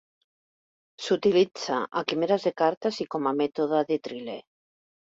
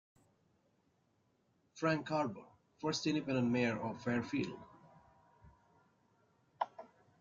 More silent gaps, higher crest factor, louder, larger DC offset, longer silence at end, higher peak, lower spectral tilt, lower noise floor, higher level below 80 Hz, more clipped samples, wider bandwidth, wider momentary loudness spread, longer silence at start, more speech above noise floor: first, 2.77-2.81 s vs none; about the same, 18 dB vs 20 dB; first, -26 LUFS vs -38 LUFS; neither; first, 0.65 s vs 0.35 s; first, -10 dBFS vs -20 dBFS; about the same, -5 dB/octave vs -5.5 dB/octave; first, under -90 dBFS vs -77 dBFS; about the same, -70 dBFS vs -74 dBFS; neither; about the same, 7.8 kHz vs 7.6 kHz; first, 14 LU vs 10 LU; second, 1 s vs 1.75 s; first, over 64 dB vs 40 dB